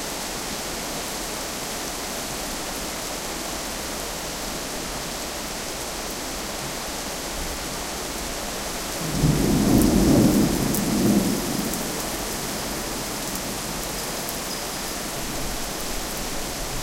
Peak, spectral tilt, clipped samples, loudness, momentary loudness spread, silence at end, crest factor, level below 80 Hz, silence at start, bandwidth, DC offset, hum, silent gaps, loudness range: -2 dBFS; -4 dB/octave; under 0.1%; -25 LUFS; 9 LU; 0 s; 24 dB; -38 dBFS; 0 s; 17 kHz; under 0.1%; none; none; 8 LU